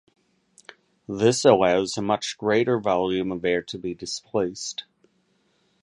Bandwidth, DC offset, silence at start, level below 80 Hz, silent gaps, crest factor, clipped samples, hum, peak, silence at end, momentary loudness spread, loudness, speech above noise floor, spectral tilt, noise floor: 11.5 kHz; under 0.1%; 1.1 s; -58 dBFS; none; 22 dB; under 0.1%; none; -2 dBFS; 1 s; 14 LU; -23 LUFS; 44 dB; -4.5 dB/octave; -67 dBFS